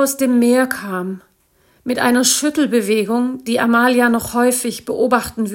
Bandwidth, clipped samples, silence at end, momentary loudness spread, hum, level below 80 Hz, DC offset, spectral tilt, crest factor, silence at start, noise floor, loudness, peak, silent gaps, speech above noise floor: 17 kHz; under 0.1%; 0 s; 10 LU; none; -54 dBFS; under 0.1%; -3 dB/octave; 16 dB; 0 s; -57 dBFS; -16 LUFS; 0 dBFS; none; 41 dB